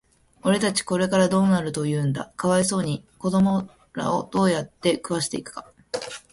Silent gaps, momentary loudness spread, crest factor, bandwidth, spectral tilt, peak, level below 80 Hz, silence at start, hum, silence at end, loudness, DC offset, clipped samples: none; 12 LU; 18 dB; 11.5 kHz; -5 dB/octave; -6 dBFS; -56 dBFS; 0.45 s; none; 0.15 s; -23 LUFS; under 0.1%; under 0.1%